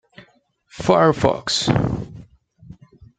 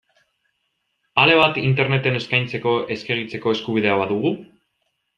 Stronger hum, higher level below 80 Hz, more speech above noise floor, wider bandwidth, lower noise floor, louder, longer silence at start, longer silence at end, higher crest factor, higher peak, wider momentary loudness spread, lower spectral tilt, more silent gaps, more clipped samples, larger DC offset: neither; first, -44 dBFS vs -60 dBFS; second, 39 dB vs 53 dB; first, 9.4 kHz vs 7.4 kHz; second, -57 dBFS vs -73 dBFS; about the same, -19 LUFS vs -19 LUFS; second, 0.75 s vs 1.15 s; second, 0.45 s vs 0.7 s; about the same, 22 dB vs 20 dB; about the same, 0 dBFS vs 0 dBFS; about the same, 12 LU vs 10 LU; second, -5 dB/octave vs -6.5 dB/octave; neither; neither; neither